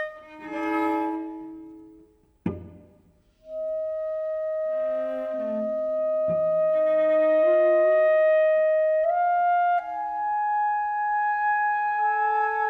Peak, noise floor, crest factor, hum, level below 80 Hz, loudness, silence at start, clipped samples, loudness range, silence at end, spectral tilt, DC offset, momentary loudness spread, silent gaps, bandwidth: -14 dBFS; -60 dBFS; 10 dB; none; -64 dBFS; -24 LUFS; 0 s; under 0.1%; 12 LU; 0 s; -7.5 dB/octave; under 0.1%; 14 LU; none; 4.2 kHz